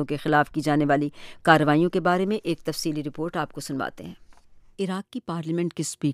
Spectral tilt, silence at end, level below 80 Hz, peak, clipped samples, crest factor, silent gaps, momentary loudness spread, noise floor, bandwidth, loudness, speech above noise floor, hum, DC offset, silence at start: -5.5 dB/octave; 0 s; -56 dBFS; -4 dBFS; under 0.1%; 22 dB; none; 12 LU; -50 dBFS; 15.5 kHz; -25 LUFS; 25 dB; none; under 0.1%; 0 s